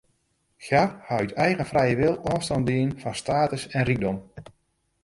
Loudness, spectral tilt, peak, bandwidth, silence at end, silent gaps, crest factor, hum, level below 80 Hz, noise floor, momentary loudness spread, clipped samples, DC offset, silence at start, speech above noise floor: -25 LUFS; -6 dB/octave; -6 dBFS; 11.5 kHz; 0.6 s; none; 20 dB; none; -50 dBFS; -71 dBFS; 6 LU; under 0.1%; under 0.1%; 0.6 s; 47 dB